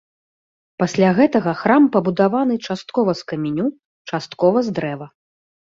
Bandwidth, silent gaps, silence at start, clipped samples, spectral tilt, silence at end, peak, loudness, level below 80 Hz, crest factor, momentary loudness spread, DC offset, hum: 7.6 kHz; 3.85-4.05 s; 0.8 s; under 0.1%; -7 dB/octave; 0.65 s; -2 dBFS; -18 LUFS; -60 dBFS; 16 dB; 13 LU; under 0.1%; none